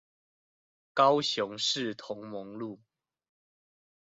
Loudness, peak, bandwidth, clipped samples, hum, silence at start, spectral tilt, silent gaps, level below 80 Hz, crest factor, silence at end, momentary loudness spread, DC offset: -29 LUFS; -10 dBFS; 8.2 kHz; under 0.1%; none; 0.95 s; -3.5 dB/octave; none; -78 dBFS; 22 dB; 1.3 s; 17 LU; under 0.1%